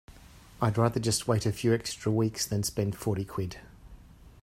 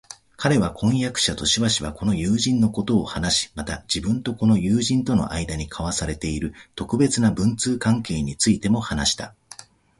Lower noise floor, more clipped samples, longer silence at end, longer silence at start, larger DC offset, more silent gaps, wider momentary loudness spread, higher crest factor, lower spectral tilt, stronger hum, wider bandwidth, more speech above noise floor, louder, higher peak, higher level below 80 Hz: first, -52 dBFS vs -46 dBFS; neither; second, 0.15 s vs 0.35 s; about the same, 0.1 s vs 0.1 s; neither; neither; about the same, 8 LU vs 10 LU; about the same, 20 dB vs 18 dB; about the same, -5 dB/octave vs -4.5 dB/octave; neither; first, 16 kHz vs 11.5 kHz; about the same, 24 dB vs 24 dB; second, -29 LUFS vs -22 LUFS; second, -10 dBFS vs -4 dBFS; second, -54 dBFS vs -40 dBFS